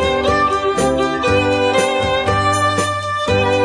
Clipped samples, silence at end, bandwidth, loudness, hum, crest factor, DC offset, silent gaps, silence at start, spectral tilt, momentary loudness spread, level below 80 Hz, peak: under 0.1%; 0 s; 11 kHz; -16 LUFS; none; 14 dB; under 0.1%; none; 0 s; -4.5 dB/octave; 2 LU; -36 dBFS; -2 dBFS